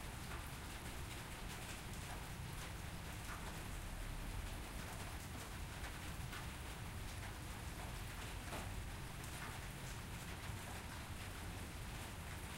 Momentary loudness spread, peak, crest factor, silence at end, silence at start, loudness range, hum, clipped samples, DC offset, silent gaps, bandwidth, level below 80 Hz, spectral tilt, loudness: 1 LU; -34 dBFS; 14 dB; 0 s; 0 s; 0 LU; none; under 0.1%; under 0.1%; none; 16 kHz; -52 dBFS; -4 dB/octave; -49 LUFS